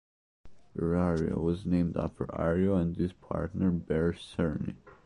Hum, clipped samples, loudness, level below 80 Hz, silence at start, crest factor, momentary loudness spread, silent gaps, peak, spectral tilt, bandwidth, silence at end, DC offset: none; under 0.1%; -31 LUFS; -46 dBFS; 0.45 s; 14 dB; 7 LU; none; -16 dBFS; -9 dB/octave; 10.5 kHz; 0.1 s; under 0.1%